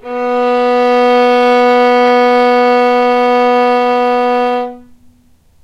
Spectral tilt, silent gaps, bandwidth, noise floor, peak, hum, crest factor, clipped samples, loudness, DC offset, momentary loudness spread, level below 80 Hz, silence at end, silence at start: -4 dB/octave; none; 8.8 kHz; -48 dBFS; 0 dBFS; none; 10 dB; under 0.1%; -10 LUFS; under 0.1%; 5 LU; -52 dBFS; 0.85 s; 0.05 s